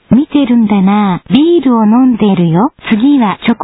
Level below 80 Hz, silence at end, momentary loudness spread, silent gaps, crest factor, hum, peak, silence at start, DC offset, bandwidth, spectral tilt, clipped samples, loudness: -44 dBFS; 0 s; 4 LU; none; 8 dB; none; 0 dBFS; 0.1 s; under 0.1%; 4 kHz; -11 dB/octave; under 0.1%; -9 LUFS